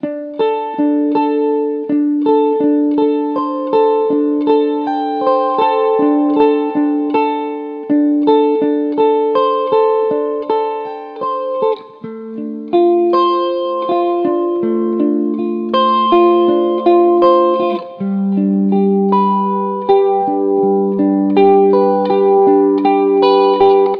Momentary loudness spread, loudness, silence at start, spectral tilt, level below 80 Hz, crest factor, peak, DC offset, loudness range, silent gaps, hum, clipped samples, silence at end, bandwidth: 8 LU; -14 LUFS; 0.05 s; -9.5 dB/octave; -62 dBFS; 12 dB; 0 dBFS; under 0.1%; 4 LU; none; none; under 0.1%; 0 s; 5.2 kHz